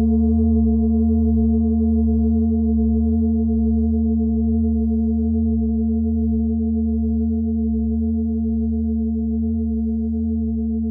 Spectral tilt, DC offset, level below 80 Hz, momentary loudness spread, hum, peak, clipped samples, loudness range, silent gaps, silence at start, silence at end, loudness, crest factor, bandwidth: -11 dB/octave; under 0.1%; -24 dBFS; 4 LU; none; -8 dBFS; under 0.1%; 3 LU; none; 0 s; 0 s; -20 LUFS; 10 dB; 1.1 kHz